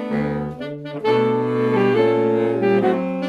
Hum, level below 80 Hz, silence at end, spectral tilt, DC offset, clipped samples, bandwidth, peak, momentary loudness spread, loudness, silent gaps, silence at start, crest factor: none; -52 dBFS; 0 s; -8 dB/octave; under 0.1%; under 0.1%; 7.4 kHz; -6 dBFS; 10 LU; -19 LUFS; none; 0 s; 14 dB